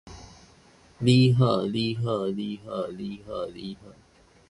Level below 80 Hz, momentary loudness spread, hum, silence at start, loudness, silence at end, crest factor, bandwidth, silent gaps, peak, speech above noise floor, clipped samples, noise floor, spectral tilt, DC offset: -56 dBFS; 20 LU; none; 0.05 s; -26 LUFS; 0.6 s; 20 dB; 11.5 kHz; none; -8 dBFS; 31 dB; under 0.1%; -56 dBFS; -7 dB/octave; under 0.1%